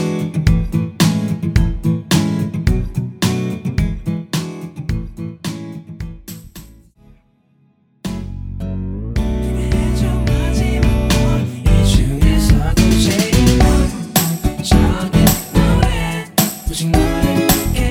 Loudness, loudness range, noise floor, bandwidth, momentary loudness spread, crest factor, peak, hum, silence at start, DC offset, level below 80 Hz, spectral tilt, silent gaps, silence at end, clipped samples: -16 LUFS; 15 LU; -56 dBFS; over 20 kHz; 14 LU; 16 dB; 0 dBFS; none; 0 s; under 0.1%; -20 dBFS; -5.5 dB/octave; none; 0 s; under 0.1%